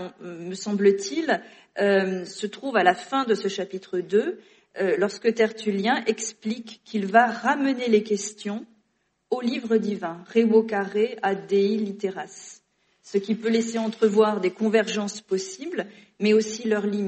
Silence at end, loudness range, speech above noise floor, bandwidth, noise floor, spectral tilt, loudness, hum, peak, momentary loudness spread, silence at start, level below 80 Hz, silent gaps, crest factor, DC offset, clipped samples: 0 s; 2 LU; 48 dB; 8.8 kHz; -72 dBFS; -4.5 dB/octave; -24 LUFS; none; -4 dBFS; 12 LU; 0 s; -74 dBFS; none; 20 dB; under 0.1%; under 0.1%